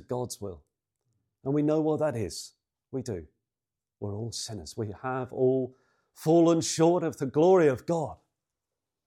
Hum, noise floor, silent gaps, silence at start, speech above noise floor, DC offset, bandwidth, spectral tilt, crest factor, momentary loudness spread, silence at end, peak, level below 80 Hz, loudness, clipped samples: none; under -90 dBFS; none; 0.1 s; over 63 dB; under 0.1%; 15 kHz; -6 dB/octave; 18 dB; 17 LU; 0.9 s; -10 dBFS; -66 dBFS; -27 LUFS; under 0.1%